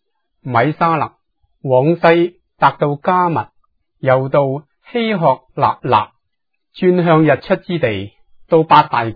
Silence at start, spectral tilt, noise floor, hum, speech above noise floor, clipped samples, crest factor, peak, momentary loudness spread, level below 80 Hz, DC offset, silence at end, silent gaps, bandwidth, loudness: 0.45 s; -9.5 dB/octave; -76 dBFS; none; 62 dB; under 0.1%; 16 dB; 0 dBFS; 13 LU; -54 dBFS; under 0.1%; 0 s; none; 5.4 kHz; -15 LUFS